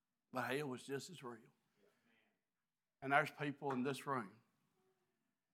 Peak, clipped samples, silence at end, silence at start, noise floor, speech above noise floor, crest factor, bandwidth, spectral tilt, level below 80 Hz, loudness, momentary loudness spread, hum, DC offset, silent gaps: -20 dBFS; under 0.1%; 1.2 s; 0.35 s; under -90 dBFS; over 47 dB; 26 dB; 17 kHz; -5 dB/octave; under -90 dBFS; -43 LUFS; 17 LU; none; under 0.1%; none